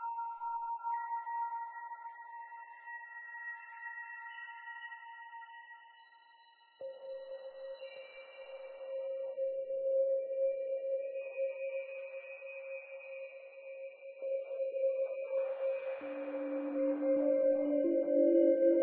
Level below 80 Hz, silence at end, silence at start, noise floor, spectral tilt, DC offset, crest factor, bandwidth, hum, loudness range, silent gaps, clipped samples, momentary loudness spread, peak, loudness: under -90 dBFS; 0 s; 0 s; -64 dBFS; -2.5 dB/octave; under 0.1%; 20 dB; 4 kHz; none; 15 LU; none; under 0.1%; 18 LU; -18 dBFS; -36 LUFS